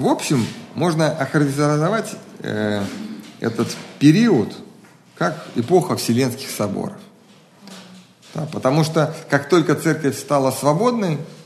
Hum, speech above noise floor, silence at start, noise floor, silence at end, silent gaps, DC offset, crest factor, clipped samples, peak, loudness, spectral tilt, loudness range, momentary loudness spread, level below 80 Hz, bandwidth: none; 30 dB; 0 s; -49 dBFS; 0 s; none; under 0.1%; 18 dB; under 0.1%; -2 dBFS; -19 LUFS; -6 dB/octave; 4 LU; 14 LU; -64 dBFS; 13 kHz